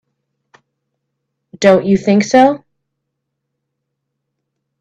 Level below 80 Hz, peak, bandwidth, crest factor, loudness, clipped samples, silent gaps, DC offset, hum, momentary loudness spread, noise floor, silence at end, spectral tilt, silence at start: -56 dBFS; 0 dBFS; 8.4 kHz; 18 dB; -12 LUFS; under 0.1%; none; under 0.1%; none; 4 LU; -75 dBFS; 2.25 s; -6 dB/octave; 1.6 s